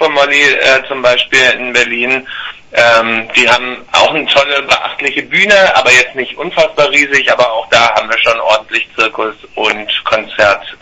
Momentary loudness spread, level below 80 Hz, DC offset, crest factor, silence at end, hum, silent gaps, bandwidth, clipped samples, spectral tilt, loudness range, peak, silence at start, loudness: 8 LU; -46 dBFS; under 0.1%; 10 dB; 0.05 s; none; none; 11 kHz; 0.4%; -2 dB/octave; 2 LU; 0 dBFS; 0 s; -9 LUFS